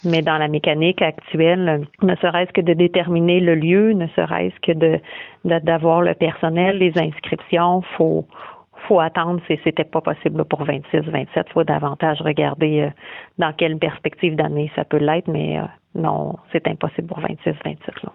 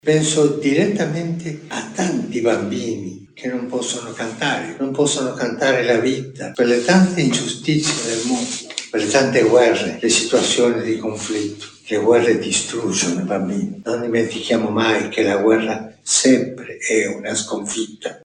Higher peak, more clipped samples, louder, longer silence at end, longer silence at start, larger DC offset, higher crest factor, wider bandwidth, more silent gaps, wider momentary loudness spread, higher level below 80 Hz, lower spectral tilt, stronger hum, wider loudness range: second, -4 dBFS vs 0 dBFS; neither; about the same, -19 LUFS vs -18 LUFS; about the same, 0.05 s vs 0.05 s; about the same, 0.05 s vs 0.05 s; neither; about the same, 16 dB vs 18 dB; second, 5.6 kHz vs 11 kHz; neither; about the same, 9 LU vs 11 LU; about the same, -58 dBFS vs -60 dBFS; first, -9 dB/octave vs -4 dB/octave; neither; about the same, 4 LU vs 5 LU